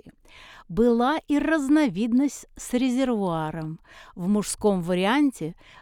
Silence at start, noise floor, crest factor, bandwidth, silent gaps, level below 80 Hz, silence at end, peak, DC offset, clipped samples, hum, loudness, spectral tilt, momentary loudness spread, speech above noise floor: 0.05 s; -49 dBFS; 14 dB; 16.5 kHz; none; -50 dBFS; 0.3 s; -10 dBFS; under 0.1%; under 0.1%; none; -24 LUFS; -5.5 dB/octave; 14 LU; 25 dB